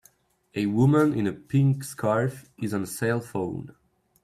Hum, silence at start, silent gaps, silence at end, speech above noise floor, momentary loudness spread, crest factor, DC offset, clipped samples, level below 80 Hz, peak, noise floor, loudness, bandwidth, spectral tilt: none; 0.55 s; none; 0.55 s; 37 dB; 12 LU; 16 dB; under 0.1%; under 0.1%; -60 dBFS; -10 dBFS; -61 dBFS; -25 LUFS; 15 kHz; -7.5 dB/octave